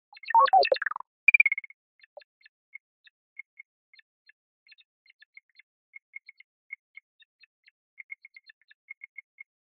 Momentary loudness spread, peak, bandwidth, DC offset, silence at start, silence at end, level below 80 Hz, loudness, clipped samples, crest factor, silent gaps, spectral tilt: 28 LU; -6 dBFS; 5.6 kHz; under 0.1%; 0.25 s; 8.2 s; -78 dBFS; -22 LUFS; under 0.1%; 26 dB; 1.07-1.27 s; 4 dB/octave